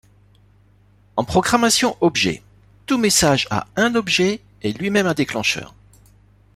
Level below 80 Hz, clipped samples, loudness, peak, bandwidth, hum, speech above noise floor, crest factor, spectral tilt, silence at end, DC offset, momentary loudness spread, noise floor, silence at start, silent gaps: -48 dBFS; under 0.1%; -18 LUFS; -2 dBFS; 15.5 kHz; 50 Hz at -45 dBFS; 35 dB; 18 dB; -3.5 dB/octave; 0.9 s; under 0.1%; 11 LU; -53 dBFS; 1.15 s; none